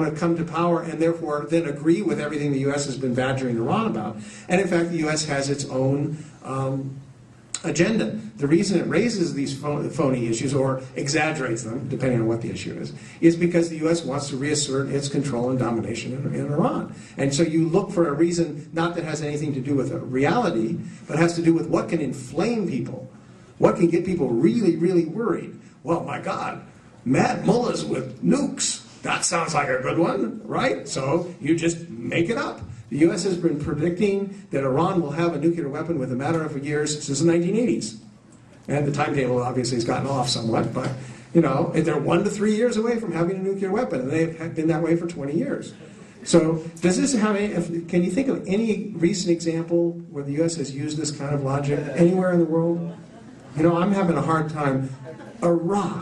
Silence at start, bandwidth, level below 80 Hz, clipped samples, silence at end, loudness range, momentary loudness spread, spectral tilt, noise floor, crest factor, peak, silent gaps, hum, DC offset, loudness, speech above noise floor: 0 s; 11 kHz; -54 dBFS; under 0.1%; 0 s; 2 LU; 9 LU; -5.5 dB/octave; -49 dBFS; 20 dB; -4 dBFS; none; none; under 0.1%; -23 LUFS; 26 dB